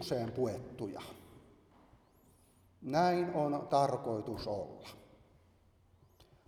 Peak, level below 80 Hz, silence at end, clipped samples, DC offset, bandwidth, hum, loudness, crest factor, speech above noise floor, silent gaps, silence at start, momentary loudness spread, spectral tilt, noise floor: -18 dBFS; -66 dBFS; 1.45 s; under 0.1%; under 0.1%; 16 kHz; none; -35 LUFS; 20 dB; 32 dB; none; 0 s; 20 LU; -6.5 dB/octave; -67 dBFS